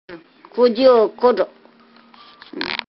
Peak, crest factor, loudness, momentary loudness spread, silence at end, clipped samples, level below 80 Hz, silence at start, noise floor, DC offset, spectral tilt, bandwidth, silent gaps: -2 dBFS; 18 dB; -16 LUFS; 16 LU; 0.15 s; under 0.1%; -62 dBFS; 0.1 s; -49 dBFS; under 0.1%; -7 dB/octave; 5.8 kHz; none